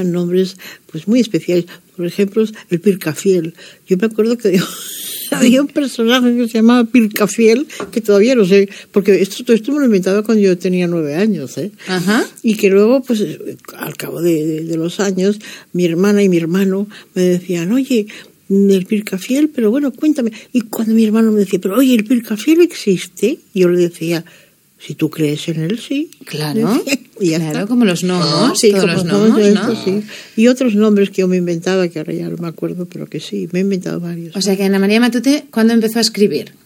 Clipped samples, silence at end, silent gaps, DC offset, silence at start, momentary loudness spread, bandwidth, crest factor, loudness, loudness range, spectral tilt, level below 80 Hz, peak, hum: under 0.1%; 0.15 s; none; under 0.1%; 0 s; 11 LU; 17 kHz; 14 dB; -15 LUFS; 5 LU; -5.5 dB/octave; -68 dBFS; 0 dBFS; none